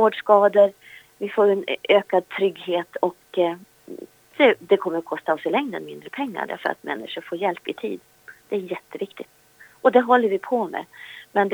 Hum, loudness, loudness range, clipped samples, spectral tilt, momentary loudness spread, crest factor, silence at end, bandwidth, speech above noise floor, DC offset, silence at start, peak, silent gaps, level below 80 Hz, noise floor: none; -22 LUFS; 8 LU; under 0.1%; -6 dB/octave; 19 LU; 20 dB; 0 s; over 20 kHz; 19 dB; under 0.1%; 0 s; -2 dBFS; none; -76 dBFS; -41 dBFS